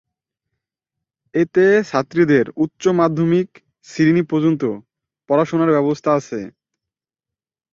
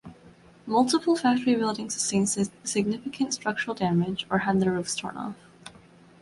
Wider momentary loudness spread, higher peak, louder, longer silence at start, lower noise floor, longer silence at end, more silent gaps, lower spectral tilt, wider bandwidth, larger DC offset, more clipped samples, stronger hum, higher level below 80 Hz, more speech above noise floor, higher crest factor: about the same, 14 LU vs 12 LU; first, -2 dBFS vs -10 dBFS; first, -17 LUFS vs -26 LUFS; first, 1.35 s vs 0.05 s; first, -88 dBFS vs -53 dBFS; first, 1.25 s vs 0.5 s; neither; first, -7.5 dB/octave vs -4.5 dB/octave; second, 7.6 kHz vs 11.5 kHz; neither; neither; neither; about the same, -60 dBFS vs -62 dBFS; first, 72 dB vs 27 dB; about the same, 16 dB vs 16 dB